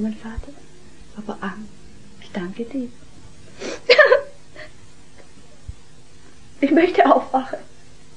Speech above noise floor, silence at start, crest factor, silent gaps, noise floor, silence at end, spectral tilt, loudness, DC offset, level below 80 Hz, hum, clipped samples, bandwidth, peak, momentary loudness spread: 28 dB; 0 s; 22 dB; none; -49 dBFS; 0.55 s; -5 dB/octave; -18 LUFS; 1%; -46 dBFS; none; under 0.1%; 10 kHz; 0 dBFS; 27 LU